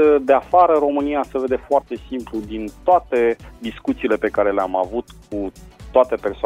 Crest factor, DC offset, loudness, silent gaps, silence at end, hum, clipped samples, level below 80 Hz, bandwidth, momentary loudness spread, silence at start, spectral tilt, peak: 18 dB; under 0.1%; -19 LUFS; none; 0 s; none; under 0.1%; -44 dBFS; 12 kHz; 14 LU; 0 s; -6.5 dB/octave; -2 dBFS